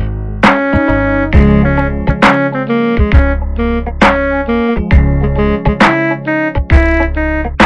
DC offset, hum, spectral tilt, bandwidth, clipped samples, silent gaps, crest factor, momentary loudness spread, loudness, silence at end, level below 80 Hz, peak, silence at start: under 0.1%; none; -7.5 dB/octave; 9.6 kHz; 0.4%; none; 10 dB; 6 LU; -12 LUFS; 0 s; -16 dBFS; 0 dBFS; 0 s